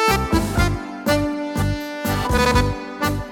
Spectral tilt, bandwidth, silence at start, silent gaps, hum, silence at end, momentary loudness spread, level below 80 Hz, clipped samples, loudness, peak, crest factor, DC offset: -5 dB/octave; 19 kHz; 0 s; none; none; 0 s; 7 LU; -28 dBFS; under 0.1%; -21 LUFS; -4 dBFS; 16 dB; under 0.1%